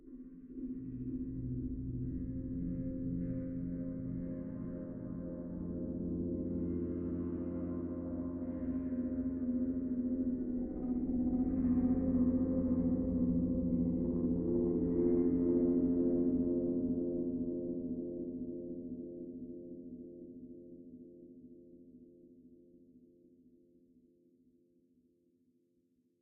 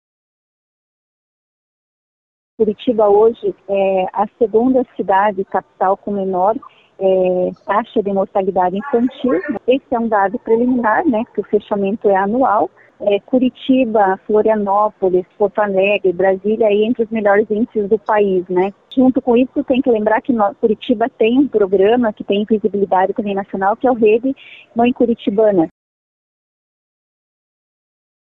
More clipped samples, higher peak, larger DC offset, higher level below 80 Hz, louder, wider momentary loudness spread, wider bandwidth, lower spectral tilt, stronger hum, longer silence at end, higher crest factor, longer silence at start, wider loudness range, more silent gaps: neither; second, -22 dBFS vs -4 dBFS; neither; about the same, -52 dBFS vs -54 dBFS; second, -36 LUFS vs -16 LUFS; first, 17 LU vs 6 LU; second, 2.2 kHz vs 4 kHz; first, -12 dB/octave vs -9.5 dB/octave; neither; first, 3.25 s vs 2.6 s; about the same, 16 dB vs 12 dB; second, 0.05 s vs 2.6 s; first, 15 LU vs 3 LU; neither